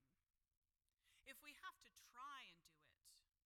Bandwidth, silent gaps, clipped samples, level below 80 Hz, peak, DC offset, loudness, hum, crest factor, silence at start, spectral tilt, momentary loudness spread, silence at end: 17.5 kHz; 0.57-0.62 s; under 0.1%; under -90 dBFS; -42 dBFS; under 0.1%; -60 LUFS; none; 22 dB; 0 s; -0.5 dB/octave; 9 LU; 0.2 s